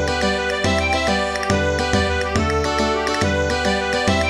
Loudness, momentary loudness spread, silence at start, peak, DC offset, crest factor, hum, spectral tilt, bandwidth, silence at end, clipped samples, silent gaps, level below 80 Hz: -19 LUFS; 1 LU; 0 s; -4 dBFS; under 0.1%; 16 dB; none; -4.5 dB/octave; 13.5 kHz; 0 s; under 0.1%; none; -32 dBFS